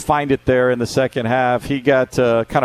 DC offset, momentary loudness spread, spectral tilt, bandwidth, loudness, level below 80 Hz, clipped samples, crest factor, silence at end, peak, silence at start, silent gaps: under 0.1%; 3 LU; -6 dB/octave; 14 kHz; -17 LUFS; -42 dBFS; under 0.1%; 16 dB; 0 s; -2 dBFS; 0 s; none